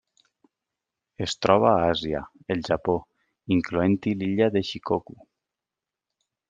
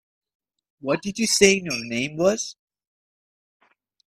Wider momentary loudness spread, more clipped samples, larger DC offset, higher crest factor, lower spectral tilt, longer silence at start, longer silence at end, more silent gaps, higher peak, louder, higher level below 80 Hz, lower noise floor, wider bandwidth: about the same, 11 LU vs 13 LU; neither; neither; about the same, 24 dB vs 24 dB; first, -6 dB/octave vs -3 dB/octave; first, 1.2 s vs 0.85 s; about the same, 1.5 s vs 1.6 s; neither; about the same, -2 dBFS vs 0 dBFS; second, -25 LUFS vs -21 LUFS; about the same, -56 dBFS vs -60 dBFS; about the same, -88 dBFS vs under -90 dBFS; second, 9.2 kHz vs 14 kHz